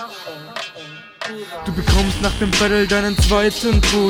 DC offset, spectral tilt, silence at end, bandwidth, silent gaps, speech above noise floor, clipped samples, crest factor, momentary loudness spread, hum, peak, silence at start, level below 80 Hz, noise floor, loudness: under 0.1%; -4.5 dB/octave; 0 s; 18.5 kHz; none; 21 dB; under 0.1%; 16 dB; 15 LU; none; -2 dBFS; 0 s; -24 dBFS; -37 dBFS; -17 LUFS